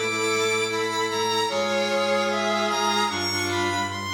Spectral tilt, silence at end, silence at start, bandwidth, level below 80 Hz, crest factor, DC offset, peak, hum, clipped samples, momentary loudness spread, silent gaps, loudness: -2.5 dB/octave; 0 s; 0 s; over 20 kHz; -68 dBFS; 12 dB; under 0.1%; -12 dBFS; none; under 0.1%; 2 LU; none; -23 LUFS